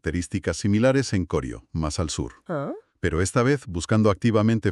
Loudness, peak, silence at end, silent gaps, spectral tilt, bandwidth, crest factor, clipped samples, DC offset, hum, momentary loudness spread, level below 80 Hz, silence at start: -24 LUFS; -6 dBFS; 0 s; none; -6 dB/octave; 12 kHz; 18 dB; under 0.1%; under 0.1%; none; 10 LU; -42 dBFS; 0.05 s